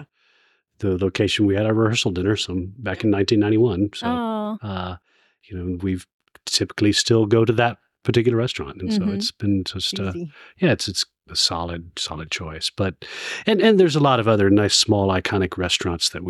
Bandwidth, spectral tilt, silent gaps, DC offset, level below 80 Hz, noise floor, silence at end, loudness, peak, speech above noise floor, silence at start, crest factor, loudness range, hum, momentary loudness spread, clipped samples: 13.5 kHz; -4.5 dB/octave; 6.13-6.19 s; under 0.1%; -50 dBFS; -62 dBFS; 0 s; -21 LUFS; -4 dBFS; 42 dB; 0 s; 16 dB; 5 LU; none; 12 LU; under 0.1%